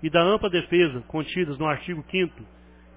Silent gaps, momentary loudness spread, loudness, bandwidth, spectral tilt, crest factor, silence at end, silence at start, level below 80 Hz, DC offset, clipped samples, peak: none; 9 LU; -24 LUFS; 4 kHz; -10 dB/octave; 18 dB; 0.5 s; 0 s; -50 dBFS; under 0.1%; under 0.1%; -6 dBFS